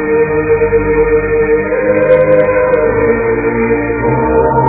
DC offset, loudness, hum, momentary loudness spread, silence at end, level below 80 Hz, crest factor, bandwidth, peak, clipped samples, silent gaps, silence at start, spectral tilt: under 0.1%; -11 LUFS; none; 4 LU; 0 s; -28 dBFS; 10 dB; 3.8 kHz; 0 dBFS; under 0.1%; none; 0 s; -12 dB/octave